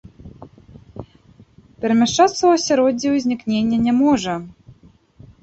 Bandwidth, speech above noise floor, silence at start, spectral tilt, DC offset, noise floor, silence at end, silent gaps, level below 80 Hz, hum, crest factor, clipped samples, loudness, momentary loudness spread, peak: 8.2 kHz; 33 dB; 0.25 s; -4.5 dB/octave; under 0.1%; -50 dBFS; 0.7 s; none; -52 dBFS; none; 18 dB; under 0.1%; -17 LUFS; 22 LU; -2 dBFS